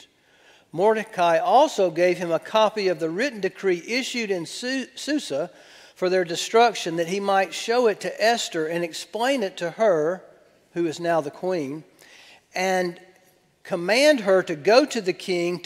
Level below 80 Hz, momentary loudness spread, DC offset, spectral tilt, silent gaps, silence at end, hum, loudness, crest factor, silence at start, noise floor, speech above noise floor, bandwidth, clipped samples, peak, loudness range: -76 dBFS; 10 LU; under 0.1%; -4 dB/octave; none; 0 s; none; -23 LUFS; 20 dB; 0.75 s; -60 dBFS; 37 dB; 16 kHz; under 0.1%; -2 dBFS; 5 LU